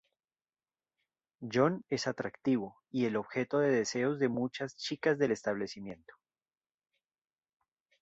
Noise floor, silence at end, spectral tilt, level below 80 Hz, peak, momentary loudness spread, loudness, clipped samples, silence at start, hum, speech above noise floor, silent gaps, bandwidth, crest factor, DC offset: under -90 dBFS; 2.05 s; -5.5 dB/octave; -74 dBFS; -14 dBFS; 10 LU; -33 LUFS; under 0.1%; 1.4 s; none; over 57 dB; none; 8 kHz; 20 dB; under 0.1%